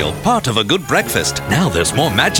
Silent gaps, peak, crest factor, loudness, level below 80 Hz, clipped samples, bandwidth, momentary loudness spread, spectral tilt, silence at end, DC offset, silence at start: none; -2 dBFS; 14 dB; -15 LUFS; -36 dBFS; under 0.1%; 18.5 kHz; 2 LU; -3.5 dB/octave; 0 s; under 0.1%; 0 s